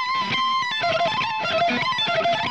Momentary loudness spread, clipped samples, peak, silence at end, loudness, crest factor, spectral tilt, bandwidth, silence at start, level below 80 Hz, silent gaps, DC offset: 2 LU; under 0.1%; -12 dBFS; 0 s; -21 LUFS; 10 dB; -3.5 dB/octave; 9.4 kHz; 0 s; -62 dBFS; none; 0.2%